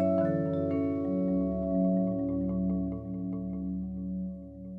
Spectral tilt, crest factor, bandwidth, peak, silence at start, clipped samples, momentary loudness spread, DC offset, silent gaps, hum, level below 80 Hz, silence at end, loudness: -12 dB/octave; 14 dB; 3.5 kHz; -16 dBFS; 0 s; under 0.1%; 8 LU; under 0.1%; none; none; -48 dBFS; 0 s; -31 LUFS